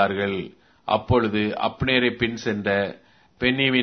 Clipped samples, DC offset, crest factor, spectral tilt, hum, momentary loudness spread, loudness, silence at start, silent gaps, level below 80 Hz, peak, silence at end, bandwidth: under 0.1%; under 0.1%; 20 dB; -6 dB/octave; none; 10 LU; -23 LUFS; 0 s; none; -48 dBFS; -4 dBFS; 0 s; 6.4 kHz